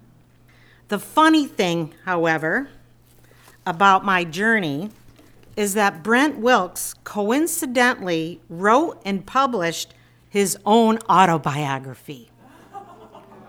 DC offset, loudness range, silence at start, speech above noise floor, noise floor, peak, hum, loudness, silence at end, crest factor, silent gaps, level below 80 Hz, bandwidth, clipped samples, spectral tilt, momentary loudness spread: under 0.1%; 2 LU; 0.9 s; 33 dB; -52 dBFS; 0 dBFS; none; -20 LUFS; 0.3 s; 20 dB; none; -58 dBFS; over 20 kHz; under 0.1%; -4 dB/octave; 16 LU